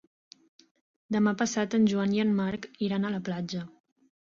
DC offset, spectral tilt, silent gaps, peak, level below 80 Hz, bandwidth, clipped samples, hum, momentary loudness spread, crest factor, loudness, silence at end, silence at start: under 0.1%; -5.5 dB/octave; none; -14 dBFS; -68 dBFS; 7.6 kHz; under 0.1%; none; 9 LU; 16 dB; -28 LUFS; 0.65 s; 1.1 s